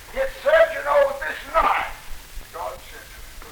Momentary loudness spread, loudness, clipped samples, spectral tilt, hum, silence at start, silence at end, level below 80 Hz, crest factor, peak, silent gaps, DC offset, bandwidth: 22 LU; -20 LUFS; under 0.1%; -3 dB/octave; none; 0 s; 0 s; -40 dBFS; 18 dB; -6 dBFS; none; under 0.1%; over 20 kHz